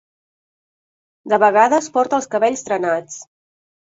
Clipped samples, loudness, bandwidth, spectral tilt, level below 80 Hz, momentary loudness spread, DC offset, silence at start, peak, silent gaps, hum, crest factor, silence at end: under 0.1%; -17 LUFS; 8 kHz; -4 dB/octave; -66 dBFS; 11 LU; under 0.1%; 1.25 s; -2 dBFS; none; none; 18 dB; 0.7 s